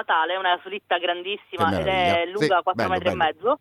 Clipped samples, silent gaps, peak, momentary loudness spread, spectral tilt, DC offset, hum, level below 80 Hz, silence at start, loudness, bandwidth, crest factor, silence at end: under 0.1%; none; -8 dBFS; 5 LU; -5 dB/octave; under 0.1%; none; -52 dBFS; 0 s; -23 LUFS; 14 kHz; 16 dB; 0.05 s